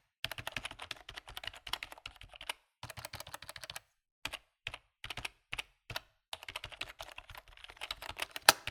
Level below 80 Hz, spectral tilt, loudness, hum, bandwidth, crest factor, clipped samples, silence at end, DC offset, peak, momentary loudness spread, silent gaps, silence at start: -62 dBFS; -0.5 dB/octave; -40 LUFS; none; 19.5 kHz; 42 dB; under 0.1%; 0 s; under 0.1%; 0 dBFS; 8 LU; 4.11-4.22 s, 6.28-6.32 s; 0.25 s